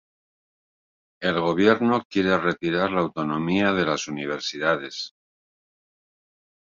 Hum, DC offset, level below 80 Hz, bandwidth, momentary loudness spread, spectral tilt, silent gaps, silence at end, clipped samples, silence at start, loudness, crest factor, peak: none; under 0.1%; -58 dBFS; 7.6 kHz; 9 LU; -5 dB/octave; 2.05-2.10 s; 1.7 s; under 0.1%; 1.2 s; -23 LUFS; 22 dB; -4 dBFS